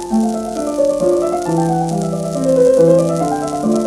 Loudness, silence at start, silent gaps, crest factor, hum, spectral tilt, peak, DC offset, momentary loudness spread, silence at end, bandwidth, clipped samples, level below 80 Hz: -15 LUFS; 0 s; none; 14 dB; none; -7 dB/octave; 0 dBFS; under 0.1%; 8 LU; 0 s; 13.5 kHz; under 0.1%; -44 dBFS